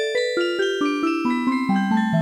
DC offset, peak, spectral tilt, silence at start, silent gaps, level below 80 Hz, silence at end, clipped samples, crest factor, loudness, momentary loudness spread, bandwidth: under 0.1%; -8 dBFS; -6 dB/octave; 0 s; none; -64 dBFS; 0 s; under 0.1%; 12 dB; -21 LUFS; 2 LU; 12 kHz